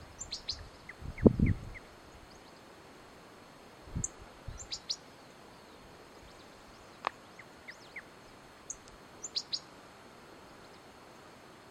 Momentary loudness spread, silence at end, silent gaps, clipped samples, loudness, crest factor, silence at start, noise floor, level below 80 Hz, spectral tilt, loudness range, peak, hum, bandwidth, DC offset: 19 LU; 0 s; none; under 0.1%; -36 LUFS; 32 dB; 0 s; -54 dBFS; -50 dBFS; -5 dB/octave; 12 LU; -6 dBFS; none; 15 kHz; under 0.1%